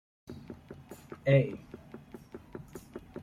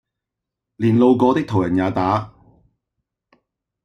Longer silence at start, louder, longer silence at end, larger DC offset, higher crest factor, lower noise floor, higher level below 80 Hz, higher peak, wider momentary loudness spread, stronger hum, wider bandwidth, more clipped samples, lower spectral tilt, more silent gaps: second, 0.3 s vs 0.8 s; second, -29 LUFS vs -18 LUFS; second, 0 s vs 1.55 s; neither; first, 22 dB vs 16 dB; second, -50 dBFS vs -83 dBFS; second, -62 dBFS vs -54 dBFS; second, -12 dBFS vs -4 dBFS; first, 23 LU vs 8 LU; neither; first, 13.5 kHz vs 8.4 kHz; neither; about the same, -8 dB/octave vs -8.5 dB/octave; neither